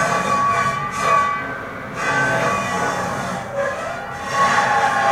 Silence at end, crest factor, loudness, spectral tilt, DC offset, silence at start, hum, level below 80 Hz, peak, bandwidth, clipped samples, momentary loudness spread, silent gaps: 0 s; 16 dB; -19 LUFS; -3.5 dB/octave; under 0.1%; 0 s; none; -48 dBFS; -4 dBFS; 16 kHz; under 0.1%; 10 LU; none